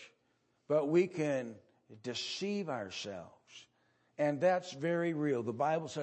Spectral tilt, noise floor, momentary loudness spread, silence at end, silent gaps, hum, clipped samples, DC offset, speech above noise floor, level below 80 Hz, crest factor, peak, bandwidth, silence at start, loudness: -5.5 dB/octave; -76 dBFS; 19 LU; 0 s; none; none; under 0.1%; under 0.1%; 42 dB; -84 dBFS; 18 dB; -18 dBFS; 8.4 kHz; 0 s; -35 LUFS